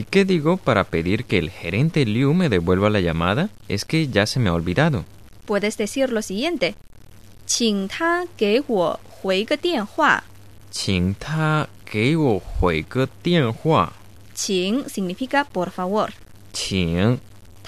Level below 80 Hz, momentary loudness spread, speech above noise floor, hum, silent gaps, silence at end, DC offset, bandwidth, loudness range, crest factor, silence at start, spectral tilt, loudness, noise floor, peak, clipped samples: -42 dBFS; 8 LU; 25 dB; none; none; 0 s; 0.5%; 14 kHz; 3 LU; 18 dB; 0 s; -5 dB/octave; -21 LUFS; -46 dBFS; -2 dBFS; under 0.1%